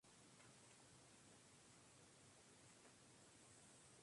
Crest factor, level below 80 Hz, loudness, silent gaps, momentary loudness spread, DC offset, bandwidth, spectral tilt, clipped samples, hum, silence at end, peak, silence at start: 14 dB; -88 dBFS; -67 LUFS; none; 1 LU; under 0.1%; 11.5 kHz; -2.5 dB/octave; under 0.1%; none; 0 s; -54 dBFS; 0 s